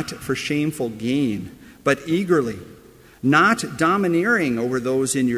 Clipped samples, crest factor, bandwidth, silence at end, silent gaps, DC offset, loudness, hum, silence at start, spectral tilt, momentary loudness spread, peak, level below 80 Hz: under 0.1%; 18 dB; 16 kHz; 0 s; none; under 0.1%; -21 LUFS; none; 0 s; -5 dB/octave; 9 LU; -4 dBFS; -54 dBFS